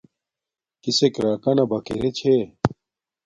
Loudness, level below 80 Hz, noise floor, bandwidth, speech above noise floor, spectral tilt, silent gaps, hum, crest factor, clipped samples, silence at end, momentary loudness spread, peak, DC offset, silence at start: -22 LUFS; -52 dBFS; -89 dBFS; 9.6 kHz; 68 dB; -5.5 dB/octave; none; none; 22 dB; under 0.1%; 0.6 s; 7 LU; 0 dBFS; under 0.1%; 0.85 s